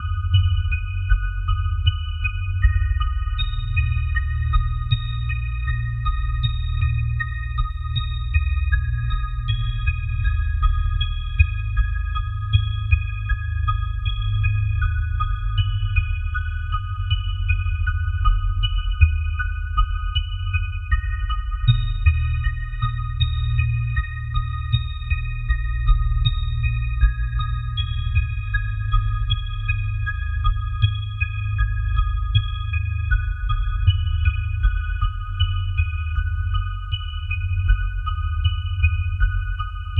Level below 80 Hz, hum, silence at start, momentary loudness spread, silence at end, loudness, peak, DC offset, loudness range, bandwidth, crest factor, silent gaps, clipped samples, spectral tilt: -22 dBFS; none; 0 s; 5 LU; 0 s; -24 LUFS; -2 dBFS; under 0.1%; 1 LU; 4 kHz; 20 dB; none; under 0.1%; -7 dB/octave